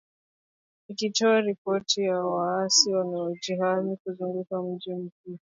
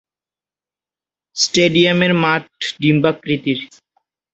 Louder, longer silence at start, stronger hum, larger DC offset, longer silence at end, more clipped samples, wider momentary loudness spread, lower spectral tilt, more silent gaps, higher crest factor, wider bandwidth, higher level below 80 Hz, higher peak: second, -26 LUFS vs -16 LUFS; second, 0.9 s vs 1.35 s; second, none vs 50 Hz at -55 dBFS; neither; second, 0.2 s vs 0.7 s; neither; about the same, 14 LU vs 12 LU; second, -3 dB/octave vs -4.5 dB/octave; first, 1.58-1.65 s, 4.00-4.05 s, 5.12-5.24 s vs none; about the same, 22 dB vs 18 dB; about the same, 7.8 kHz vs 8.2 kHz; second, -78 dBFS vs -56 dBFS; second, -6 dBFS vs 0 dBFS